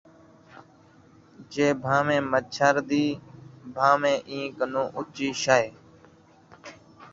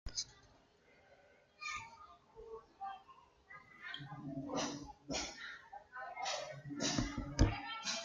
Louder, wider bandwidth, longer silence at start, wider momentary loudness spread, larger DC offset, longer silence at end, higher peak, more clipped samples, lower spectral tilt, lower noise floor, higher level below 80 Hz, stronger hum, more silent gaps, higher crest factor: first, -25 LUFS vs -42 LUFS; second, 7.8 kHz vs 9.4 kHz; first, 0.55 s vs 0.05 s; about the same, 20 LU vs 20 LU; neither; about the same, 0.05 s vs 0 s; first, -4 dBFS vs -16 dBFS; neither; about the same, -4.5 dB/octave vs -3.5 dB/octave; second, -55 dBFS vs -68 dBFS; second, -64 dBFS vs -50 dBFS; neither; neither; about the same, 24 dB vs 26 dB